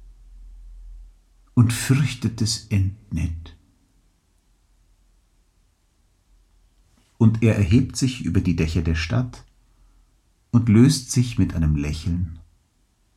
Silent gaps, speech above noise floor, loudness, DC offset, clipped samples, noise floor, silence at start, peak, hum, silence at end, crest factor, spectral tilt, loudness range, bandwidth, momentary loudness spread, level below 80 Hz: none; 44 dB; -21 LUFS; under 0.1%; under 0.1%; -64 dBFS; 0 s; -4 dBFS; none; 0.8 s; 20 dB; -6 dB/octave; 8 LU; 15 kHz; 11 LU; -38 dBFS